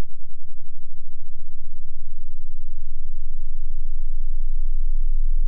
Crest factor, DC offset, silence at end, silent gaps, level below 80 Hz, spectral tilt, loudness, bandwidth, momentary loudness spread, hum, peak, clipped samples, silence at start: 4 dB; under 0.1%; 0 s; none; -20 dBFS; -21 dB/octave; -33 LUFS; 0.1 kHz; 16 LU; none; -10 dBFS; under 0.1%; 0 s